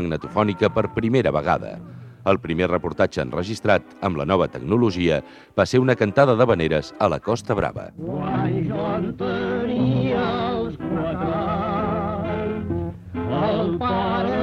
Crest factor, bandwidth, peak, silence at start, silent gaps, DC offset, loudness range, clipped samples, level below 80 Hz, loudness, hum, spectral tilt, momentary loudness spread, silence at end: 20 dB; 10.5 kHz; -2 dBFS; 0 s; none; under 0.1%; 4 LU; under 0.1%; -44 dBFS; -22 LUFS; none; -7 dB/octave; 8 LU; 0 s